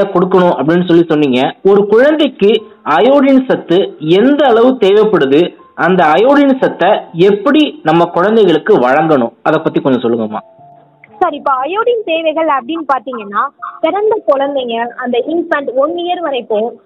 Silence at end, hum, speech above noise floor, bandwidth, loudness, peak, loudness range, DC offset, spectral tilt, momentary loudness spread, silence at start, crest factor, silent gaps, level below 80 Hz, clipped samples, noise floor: 0.1 s; none; 31 dB; 7.8 kHz; -11 LUFS; 0 dBFS; 5 LU; under 0.1%; -7.5 dB/octave; 8 LU; 0 s; 10 dB; none; -56 dBFS; under 0.1%; -41 dBFS